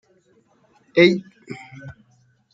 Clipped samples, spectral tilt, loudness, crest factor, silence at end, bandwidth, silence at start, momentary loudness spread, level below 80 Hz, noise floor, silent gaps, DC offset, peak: under 0.1%; -6.5 dB/octave; -18 LUFS; 22 dB; 0.65 s; 7.6 kHz; 0.95 s; 25 LU; -64 dBFS; -60 dBFS; none; under 0.1%; -2 dBFS